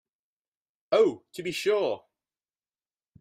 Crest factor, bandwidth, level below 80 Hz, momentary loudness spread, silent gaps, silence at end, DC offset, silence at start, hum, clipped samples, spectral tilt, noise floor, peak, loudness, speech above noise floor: 20 dB; 15.5 kHz; -74 dBFS; 12 LU; none; 1.25 s; under 0.1%; 0.9 s; none; under 0.1%; -4.5 dB/octave; under -90 dBFS; -10 dBFS; -27 LUFS; over 64 dB